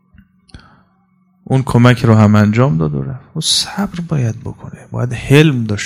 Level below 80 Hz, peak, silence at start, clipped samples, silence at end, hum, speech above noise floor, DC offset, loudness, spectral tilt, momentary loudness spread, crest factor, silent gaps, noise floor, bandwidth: -40 dBFS; 0 dBFS; 0.55 s; 0.5%; 0 s; none; 43 dB; under 0.1%; -13 LUFS; -5.5 dB/octave; 15 LU; 14 dB; none; -56 dBFS; 15 kHz